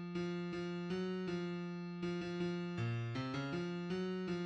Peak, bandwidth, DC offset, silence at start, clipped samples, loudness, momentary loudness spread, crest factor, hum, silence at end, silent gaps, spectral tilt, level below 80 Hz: -28 dBFS; 8.4 kHz; under 0.1%; 0 s; under 0.1%; -41 LUFS; 2 LU; 12 dB; none; 0 s; none; -7 dB/octave; -70 dBFS